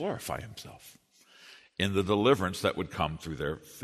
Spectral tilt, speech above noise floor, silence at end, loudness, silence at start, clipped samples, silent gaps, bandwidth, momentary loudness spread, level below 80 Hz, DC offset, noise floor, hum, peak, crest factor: -5 dB/octave; 26 dB; 0 s; -30 LUFS; 0 s; under 0.1%; none; 13.5 kHz; 20 LU; -54 dBFS; under 0.1%; -56 dBFS; none; -10 dBFS; 22 dB